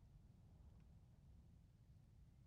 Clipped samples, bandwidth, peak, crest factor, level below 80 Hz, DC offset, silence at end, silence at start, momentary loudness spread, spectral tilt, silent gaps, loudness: under 0.1%; 6.2 kHz; -56 dBFS; 12 dB; -70 dBFS; under 0.1%; 0 s; 0 s; 1 LU; -8.5 dB/octave; none; -69 LUFS